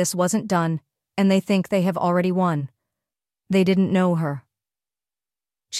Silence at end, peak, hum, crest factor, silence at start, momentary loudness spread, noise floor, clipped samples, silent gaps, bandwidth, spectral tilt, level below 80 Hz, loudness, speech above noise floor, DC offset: 0 s; -8 dBFS; none; 14 dB; 0 s; 10 LU; under -90 dBFS; under 0.1%; none; 14.5 kHz; -6 dB/octave; -64 dBFS; -21 LUFS; over 70 dB; under 0.1%